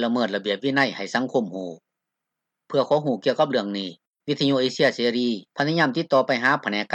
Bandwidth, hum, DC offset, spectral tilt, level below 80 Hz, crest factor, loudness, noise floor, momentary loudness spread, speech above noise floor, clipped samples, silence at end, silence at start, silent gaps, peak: 9 kHz; none; under 0.1%; -5.5 dB/octave; -76 dBFS; 18 dB; -23 LUFS; -84 dBFS; 10 LU; 61 dB; under 0.1%; 0 s; 0 s; 4.07-4.12 s; -6 dBFS